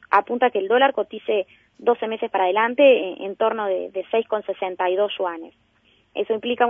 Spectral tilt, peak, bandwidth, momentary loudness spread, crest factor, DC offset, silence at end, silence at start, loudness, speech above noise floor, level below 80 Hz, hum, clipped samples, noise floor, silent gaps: -6.5 dB/octave; -2 dBFS; 4.4 kHz; 12 LU; 18 dB; under 0.1%; 0 s; 0.1 s; -21 LUFS; 40 dB; -72 dBFS; none; under 0.1%; -61 dBFS; none